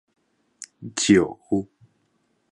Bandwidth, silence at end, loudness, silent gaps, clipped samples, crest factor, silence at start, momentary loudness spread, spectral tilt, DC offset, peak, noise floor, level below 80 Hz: 11.5 kHz; 0.9 s; -22 LUFS; none; under 0.1%; 22 dB; 0.6 s; 24 LU; -4.5 dB/octave; under 0.1%; -4 dBFS; -69 dBFS; -56 dBFS